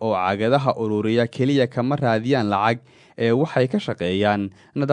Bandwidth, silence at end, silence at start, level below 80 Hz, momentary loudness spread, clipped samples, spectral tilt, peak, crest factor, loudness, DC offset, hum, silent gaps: 10 kHz; 0 s; 0 s; -64 dBFS; 5 LU; under 0.1%; -7.5 dB/octave; -4 dBFS; 18 dB; -21 LUFS; under 0.1%; none; none